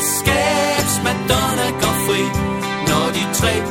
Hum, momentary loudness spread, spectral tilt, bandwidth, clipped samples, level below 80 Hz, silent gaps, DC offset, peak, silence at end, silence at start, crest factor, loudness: none; 4 LU; -3.5 dB/octave; 17.5 kHz; under 0.1%; -34 dBFS; none; under 0.1%; -2 dBFS; 0 s; 0 s; 16 dB; -17 LUFS